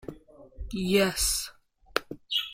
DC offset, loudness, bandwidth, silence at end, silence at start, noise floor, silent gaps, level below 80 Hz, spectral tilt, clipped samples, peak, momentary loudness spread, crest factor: under 0.1%; -28 LUFS; 16.5 kHz; 0 s; 0.05 s; -53 dBFS; none; -44 dBFS; -3 dB/octave; under 0.1%; -4 dBFS; 17 LU; 26 dB